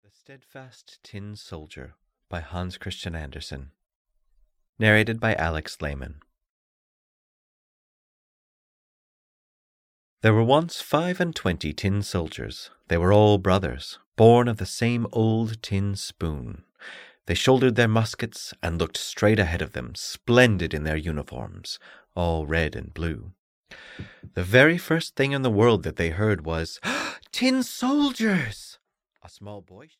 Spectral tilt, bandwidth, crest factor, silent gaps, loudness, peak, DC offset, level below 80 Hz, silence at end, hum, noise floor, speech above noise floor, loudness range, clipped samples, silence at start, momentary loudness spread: -5.5 dB/octave; 16 kHz; 22 dB; 3.95-4.05 s, 4.69-4.73 s, 6.49-10.17 s, 14.06-14.12 s, 23.38-23.64 s; -23 LUFS; -4 dBFS; under 0.1%; -44 dBFS; 0.15 s; none; -64 dBFS; 40 dB; 11 LU; under 0.1%; 0.3 s; 21 LU